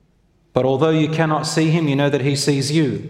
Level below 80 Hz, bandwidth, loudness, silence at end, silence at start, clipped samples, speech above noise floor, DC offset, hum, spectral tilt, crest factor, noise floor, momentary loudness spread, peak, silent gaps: -56 dBFS; 14 kHz; -18 LUFS; 0 s; 0.55 s; under 0.1%; 41 dB; under 0.1%; none; -5.5 dB/octave; 18 dB; -58 dBFS; 2 LU; 0 dBFS; none